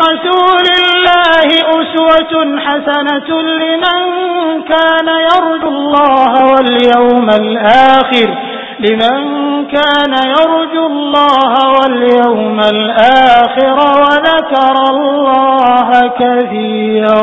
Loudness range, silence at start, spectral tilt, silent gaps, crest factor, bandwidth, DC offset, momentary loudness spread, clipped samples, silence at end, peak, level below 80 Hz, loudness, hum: 3 LU; 0 s; -5.5 dB/octave; none; 8 dB; 8 kHz; under 0.1%; 7 LU; 0.6%; 0 s; 0 dBFS; -48 dBFS; -9 LUFS; none